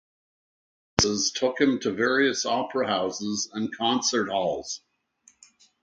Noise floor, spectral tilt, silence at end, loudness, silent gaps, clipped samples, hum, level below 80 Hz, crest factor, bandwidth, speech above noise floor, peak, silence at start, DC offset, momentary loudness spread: -62 dBFS; -3 dB/octave; 1.05 s; -25 LUFS; none; under 0.1%; none; -54 dBFS; 26 dB; 9.2 kHz; 36 dB; 0 dBFS; 1 s; under 0.1%; 7 LU